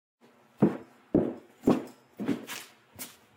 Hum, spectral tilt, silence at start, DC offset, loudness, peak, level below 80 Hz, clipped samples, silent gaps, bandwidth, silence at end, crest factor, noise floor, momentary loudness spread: none; -6.5 dB/octave; 0.6 s; under 0.1%; -31 LUFS; -12 dBFS; -60 dBFS; under 0.1%; none; 16 kHz; 0.3 s; 20 dB; -47 dBFS; 15 LU